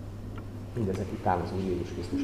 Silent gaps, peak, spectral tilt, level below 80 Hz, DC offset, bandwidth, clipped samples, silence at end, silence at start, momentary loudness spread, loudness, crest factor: none; -12 dBFS; -7.5 dB/octave; -46 dBFS; 0.2%; 14.5 kHz; under 0.1%; 0 s; 0 s; 11 LU; -33 LUFS; 18 dB